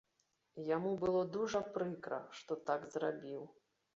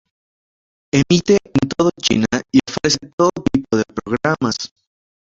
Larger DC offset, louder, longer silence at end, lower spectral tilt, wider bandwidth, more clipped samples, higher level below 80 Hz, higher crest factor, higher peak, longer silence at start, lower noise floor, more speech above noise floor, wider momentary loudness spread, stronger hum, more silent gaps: neither; second, -40 LUFS vs -17 LUFS; about the same, 0.45 s vs 0.55 s; about the same, -5.5 dB/octave vs -5 dB/octave; about the same, 7.6 kHz vs 7.8 kHz; neither; second, -74 dBFS vs -46 dBFS; about the same, 18 dB vs 16 dB; second, -22 dBFS vs -2 dBFS; second, 0.55 s vs 0.95 s; second, -81 dBFS vs under -90 dBFS; second, 42 dB vs over 74 dB; first, 12 LU vs 6 LU; neither; second, none vs 3.13-3.18 s